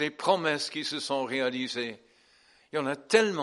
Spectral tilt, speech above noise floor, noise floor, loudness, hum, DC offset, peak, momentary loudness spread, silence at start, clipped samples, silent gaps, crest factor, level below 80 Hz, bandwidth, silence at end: -3.5 dB/octave; 33 dB; -62 dBFS; -29 LUFS; none; under 0.1%; -6 dBFS; 9 LU; 0 s; under 0.1%; none; 24 dB; -78 dBFS; 11.5 kHz; 0 s